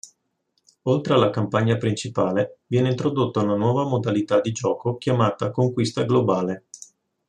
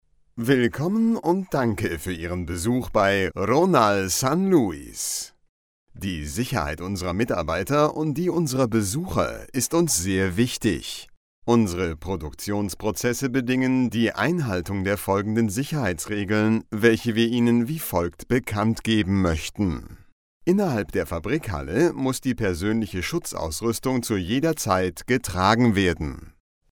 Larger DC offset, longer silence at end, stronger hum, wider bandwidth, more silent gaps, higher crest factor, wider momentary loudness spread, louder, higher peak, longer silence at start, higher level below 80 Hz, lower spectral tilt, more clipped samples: neither; about the same, 0.5 s vs 0.4 s; neither; second, 9.8 kHz vs 19 kHz; second, none vs 5.49-5.87 s, 11.17-11.42 s, 20.12-20.41 s; about the same, 20 dB vs 20 dB; second, 5 LU vs 9 LU; about the same, -22 LUFS vs -23 LUFS; about the same, -4 dBFS vs -2 dBFS; second, 0.05 s vs 0.35 s; second, -62 dBFS vs -44 dBFS; first, -6.5 dB/octave vs -5 dB/octave; neither